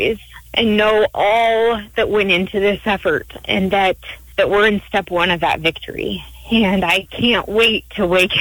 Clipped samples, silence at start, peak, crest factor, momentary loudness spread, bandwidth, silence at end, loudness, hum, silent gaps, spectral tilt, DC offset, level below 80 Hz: under 0.1%; 0 s; 0 dBFS; 16 dB; 8 LU; over 20 kHz; 0 s; -16 LUFS; none; none; -5 dB/octave; under 0.1%; -40 dBFS